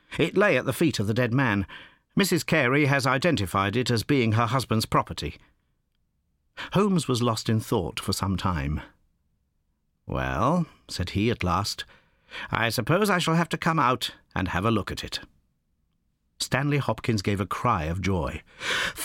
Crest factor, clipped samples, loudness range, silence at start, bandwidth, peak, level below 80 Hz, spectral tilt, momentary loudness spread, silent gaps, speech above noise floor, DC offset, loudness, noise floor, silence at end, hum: 22 dB; under 0.1%; 5 LU; 0.1 s; 17 kHz; -4 dBFS; -46 dBFS; -5 dB/octave; 11 LU; none; 47 dB; under 0.1%; -25 LUFS; -72 dBFS; 0 s; none